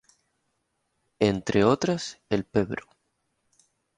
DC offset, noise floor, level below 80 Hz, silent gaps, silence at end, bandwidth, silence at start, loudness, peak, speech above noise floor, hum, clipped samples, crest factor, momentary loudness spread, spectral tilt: under 0.1%; -76 dBFS; -56 dBFS; none; 1.2 s; 10.5 kHz; 1.2 s; -26 LUFS; -6 dBFS; 51 dB; none; under 0.1%; 22 dB; 10 LU; -6 dB/octave